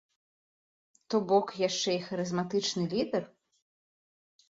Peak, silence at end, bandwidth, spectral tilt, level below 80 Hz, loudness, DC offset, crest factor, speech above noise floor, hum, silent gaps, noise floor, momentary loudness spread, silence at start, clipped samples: -12 dBFS; 1.25 s; 7.8 kHz; -4.5 dB/octave; -74 dBFS; -30 LUFS; under 0.1%; 20 dB; over 60 dB; none; none; under -90 dBFS; 6 LU; 1.1 s; under 0.1%